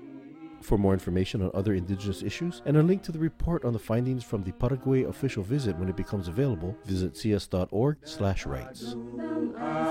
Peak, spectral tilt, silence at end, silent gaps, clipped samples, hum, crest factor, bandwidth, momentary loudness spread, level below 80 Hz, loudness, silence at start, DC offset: -12 dBFS; -7.5 dB/octave; 0 s; none; under 0.1%; none; 16 dB; 16 kHz; 9 LU; -44 dBFS; -29 LUFS; 0 s; under 0.1%